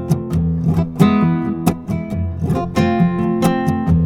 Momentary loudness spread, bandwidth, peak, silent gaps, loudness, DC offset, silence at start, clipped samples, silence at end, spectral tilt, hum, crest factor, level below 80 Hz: 7 LU; 16 kHz; 0 dBFS; none; -17 LUFS; under 0.1%; 0 s; under 0.1%; 0 s; -8 dB/octave; none; 16 dB; -38 dBFS